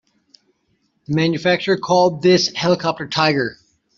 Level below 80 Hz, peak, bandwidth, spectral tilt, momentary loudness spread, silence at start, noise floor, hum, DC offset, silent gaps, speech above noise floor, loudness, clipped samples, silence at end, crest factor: -58 dBFS; -2 dBFS; 7.6 kHz; -5 dB/octave; 7 LU; 1.1 s; -66 dBFS; none; under 0.1%; none; 49 dB; -17 LUFS; under 0.1%; 0.45 s; 16 dB